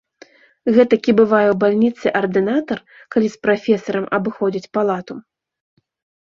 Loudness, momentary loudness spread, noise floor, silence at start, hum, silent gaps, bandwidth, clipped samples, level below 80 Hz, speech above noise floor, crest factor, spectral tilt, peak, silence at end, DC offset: -17 LUFS; 12 LU; -48 dBFS; 0.65 s; none; none; 7.2 kHz; under 0.1%; -60 dBFS; 31 dB; 16 dB; -7 dB/octave; -2 dBFS; 1 s; under 0.1%